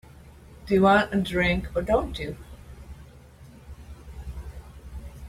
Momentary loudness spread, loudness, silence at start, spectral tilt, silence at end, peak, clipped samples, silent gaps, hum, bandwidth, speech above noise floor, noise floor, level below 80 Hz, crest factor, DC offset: 26 LU; -24 LUFS; 0.25 s; -6.5 dB/octave; 0 s; -8 dBFS; under 0.1%; none; none; 15 kHz; 25 dB; -48 dBFS; -40 dBFS; 20 dB; under 0.1%